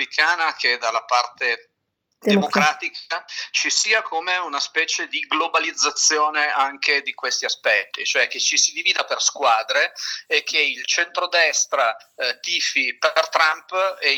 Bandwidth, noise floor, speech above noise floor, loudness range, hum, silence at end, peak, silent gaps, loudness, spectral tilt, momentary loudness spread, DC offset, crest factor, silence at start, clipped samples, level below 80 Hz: over 20 kHz; -75 dBFS; 54 dB; 2 LU; none; 0 s; -2 dBFS; none; -19 LUFS; -0.5 dB/octave; 6 LU; under 0.1%; 18 dB; 0 s; under 0.1%; -84 dBFS